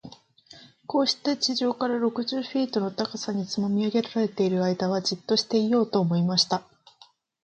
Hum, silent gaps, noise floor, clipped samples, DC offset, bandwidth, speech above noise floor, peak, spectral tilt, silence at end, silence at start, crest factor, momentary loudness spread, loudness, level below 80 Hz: none; none; -58 dBFS; under 0.1%; under 0.1%; 8.8 kHz; 33 dB; -8 dBFS; -5 dB/octave; 0.85 s; 0.05 s; 18 dB; 6 LU; -25 LUFS; -70 dBFS